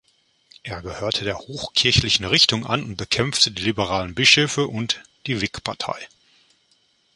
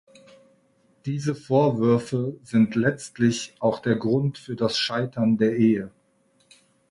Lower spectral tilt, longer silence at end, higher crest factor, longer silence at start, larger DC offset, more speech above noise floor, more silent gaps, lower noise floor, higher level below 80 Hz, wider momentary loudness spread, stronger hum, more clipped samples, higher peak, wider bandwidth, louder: second, -3 dB/octave vs -6 dB/octave; about the same, 1.1 s vs 1 s; first, 22 dB vs 16 dB; second, 0.65 s vs 1.05 s; neither; about the same, 41 dB vs 42 dB; neither; about the same, -63 dBFS vs -64 dBFS; first, -44 dBFS vs -62 dBFS; first, 14 LU vs 8 LU; neither; neither; first, 0 dBFS vs -8 dBFS; about the same, 11.5 kHz vs 11.5 kHz; first, -20 LUFS vs -23 LUFS